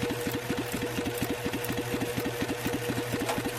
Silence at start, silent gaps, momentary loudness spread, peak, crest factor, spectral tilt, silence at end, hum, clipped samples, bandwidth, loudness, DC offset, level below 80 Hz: 0 s; none; 1 LU; -16 dBFS; 16 dB; -4.5 dB/octave; 0 s; none; under 0.1%; 16.5 kHz; -31 LUFS; under 0.1%; -52 dBFS